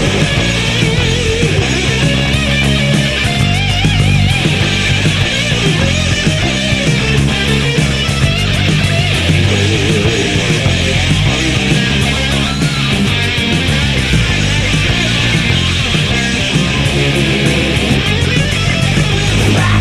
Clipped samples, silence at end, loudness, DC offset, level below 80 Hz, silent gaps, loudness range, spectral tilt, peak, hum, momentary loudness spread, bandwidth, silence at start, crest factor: under 0.1%; 0 s; -12 LUFS; under 0.1%; -24 dBFS; none; 1 LU; -4.5 dB/octave; 0 dBFS; none; 1 LU; 14.5 kHz; 0 s; 12 dB